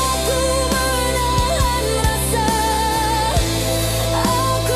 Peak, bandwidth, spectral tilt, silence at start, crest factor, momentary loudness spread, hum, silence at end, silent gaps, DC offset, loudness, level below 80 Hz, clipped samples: -6 dBFS; 15.5 kHz; -3.5 dB/octave; 0 s; 12 dB; 1 LU; none; 0 s; none; under 0.1%; -18 LUFS; -26 dBFS; under 0.1%